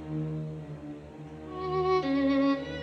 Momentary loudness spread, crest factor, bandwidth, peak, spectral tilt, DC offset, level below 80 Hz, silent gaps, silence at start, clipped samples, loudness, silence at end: 18 LU; 14 dB; 6.4 kHz; -16 dBFS; -8 dB/octave; under 0.1%; -54 dBFS; none; 0 s; under 0.1%; -29 LUFS; 0 s